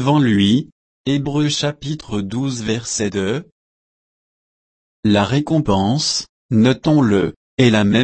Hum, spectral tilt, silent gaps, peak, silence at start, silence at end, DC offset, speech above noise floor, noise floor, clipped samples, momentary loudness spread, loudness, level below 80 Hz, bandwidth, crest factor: none; -5.5 dB/octave; 0.72-1.04 s, 3.52-5.03 s, 6.29-6.49 s, 7.36-7.57 s; -2 dBFS; 0 s; 0 s; under 0.1%; over 74 dB; under -90 dBFS; under 0.1%; 9 LU; -17 LUFS; -46 dBFS; 8.8 kHz; 16 dB